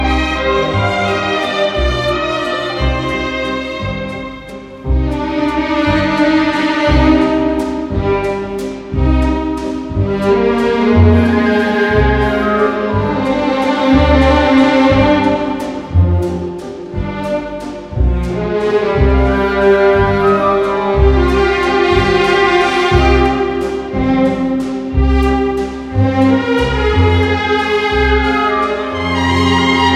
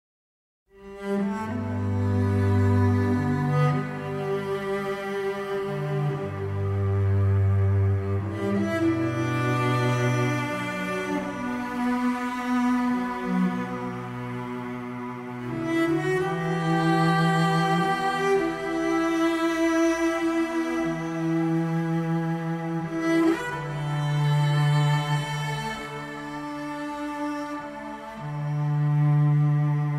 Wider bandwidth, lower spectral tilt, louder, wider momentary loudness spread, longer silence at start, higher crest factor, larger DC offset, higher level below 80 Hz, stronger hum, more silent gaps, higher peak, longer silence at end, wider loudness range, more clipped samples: second, 11.5 kHz vs 14 kHz; about the same, -6.5 dB/octave vs -7 dB/octave; first, -13 LUFS vs -26 LUFS; about the same, 9 LU vs 11 LU; second, 0 s vs 0.75 s; about the same, 12 dB vs 14 dB; neither; first, -22 dBFS vs -56 dBFS; neither; neither; first, 0 dBFS vs -12 dBFS; about the same, 0 s vs 0 s; about the same, 5 LU vs 5 LU; neither